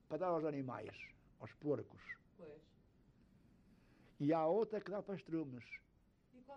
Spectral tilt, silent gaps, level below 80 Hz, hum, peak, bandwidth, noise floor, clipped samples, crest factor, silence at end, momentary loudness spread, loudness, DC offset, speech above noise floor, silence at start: -8.5 dB/octave; none; -76 dBFS; none; -26 dBFS; 7 kHz; -72 dBFS; under 0.1%; 18 dB; 0 s; 21 LU; -42 LUFS; under 0.1%; 30 dB; 0.1 s